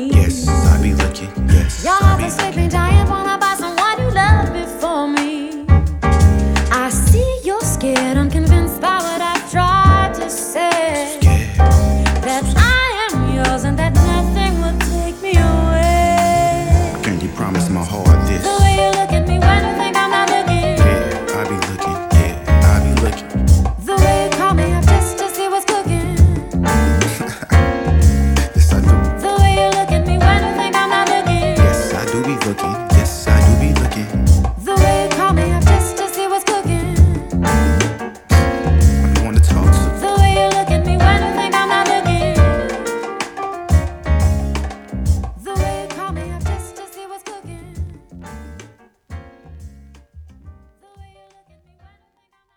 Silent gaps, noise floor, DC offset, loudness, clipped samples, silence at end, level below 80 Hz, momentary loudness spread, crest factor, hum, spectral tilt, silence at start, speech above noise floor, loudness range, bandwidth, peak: none; -63 dBFS; under 0.1%; -15 LUFS; under 0.1%; 2.05 s; -18 dBFS; 8 LU; 14 dB; none; -5.5 dB/octave; 0 s; 49 dB; 6 LU; 18 kHz; 0 dBFS